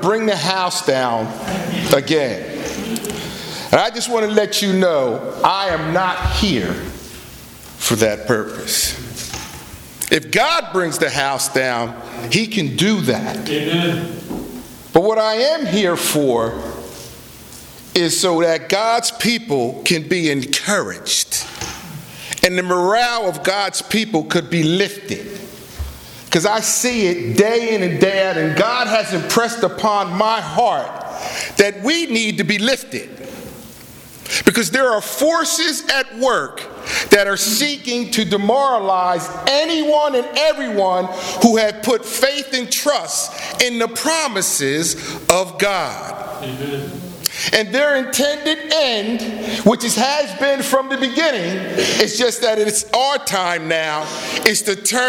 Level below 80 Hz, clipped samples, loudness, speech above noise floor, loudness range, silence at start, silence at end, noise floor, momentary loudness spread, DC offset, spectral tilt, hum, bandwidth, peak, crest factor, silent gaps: -42 dBFS; under 0.1%; -17 LUFS; 21 dB; 3 LU; 0 s; 0 s; -38 dBFS; 13 LU; under 0.1%; -3 dB/octave; none; 19.5 kHz; 0 dBFS; 18 dB; none